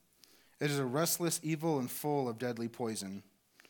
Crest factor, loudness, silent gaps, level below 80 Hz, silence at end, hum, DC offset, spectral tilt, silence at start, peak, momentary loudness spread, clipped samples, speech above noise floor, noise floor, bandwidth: 18 dB; -35 LUFS; none; -84 dBFS; 0.5 s; none; under 0.1%; -4.5 dB/octave; 0.6 s; -18 dBFS; 8 LU; under 0.1%; 30 dB; -65 dBFS; 19 kHz